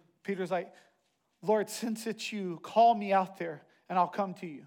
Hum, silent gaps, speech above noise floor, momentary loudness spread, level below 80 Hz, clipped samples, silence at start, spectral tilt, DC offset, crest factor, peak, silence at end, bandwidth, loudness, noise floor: none; none; 41 dB; 14 LU; under -90 dBFS; under 0.1%; 0.25 s; -5 dB/octave; under 0.1%; 18 dB; -14 dBFS; 0 s; 17.5 kHz; -31 LUFS; -72 dBFS